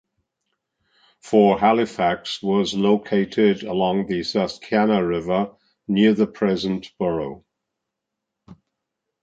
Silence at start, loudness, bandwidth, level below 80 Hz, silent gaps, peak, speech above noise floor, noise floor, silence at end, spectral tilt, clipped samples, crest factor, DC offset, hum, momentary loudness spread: 1.25 s; -21 LUFS; 7.8 kHz; -56 dBFS; none; -4 dBFS; 62 dB; -82 dBFS; 0.7 s; -6.5 dB/octave; under 0.1%; 18 dB; under 0.1%; none; 8 LU